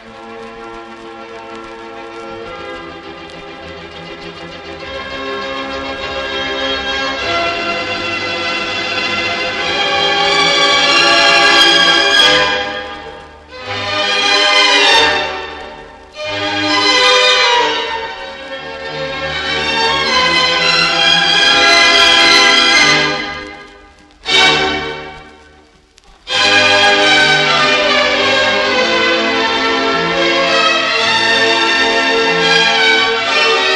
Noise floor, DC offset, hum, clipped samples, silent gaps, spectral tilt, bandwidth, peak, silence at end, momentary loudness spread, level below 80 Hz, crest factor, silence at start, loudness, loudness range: -46 dBFS; under 0.1%; none; under 0.1%; none; -1.5 dB/octave; 15 kHz; 0 dBFS; 0 s; 22 LU; -44 dBFS; 14 dB; 0 s; -10 LUFS; 16 LU